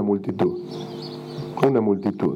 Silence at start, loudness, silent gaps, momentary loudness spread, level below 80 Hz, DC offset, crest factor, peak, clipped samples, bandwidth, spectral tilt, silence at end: 0 s; -24 LUFS; none; 13 LU; -64 dBFS; under 0.1%; 22 dB; 0 dBFS; under 0.1%; 15 kHz; -8.5 dB/octave; 0 s